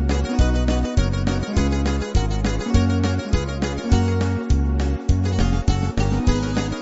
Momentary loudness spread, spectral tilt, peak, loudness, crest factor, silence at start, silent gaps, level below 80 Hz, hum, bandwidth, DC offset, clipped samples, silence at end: 3 LU; -6.5 dB/octave; -4 dBFS; -21 LUFS; 16 dB; 0 s; none; -24 dBFS; none; 8 kHz; under 0.1%; under 0.1%; 0 s